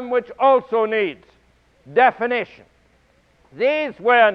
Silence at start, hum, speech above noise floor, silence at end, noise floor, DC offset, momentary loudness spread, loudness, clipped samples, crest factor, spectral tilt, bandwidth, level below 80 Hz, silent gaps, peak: 0 s; none; 40 dB; 0 s; -58 dBFS; under 0.1%; 8 LU; -19 LUFS; under 0.1%; 18 dB; -6 dB/octave; 5.8 kHz; -62 dBFS; none; -2 dBFS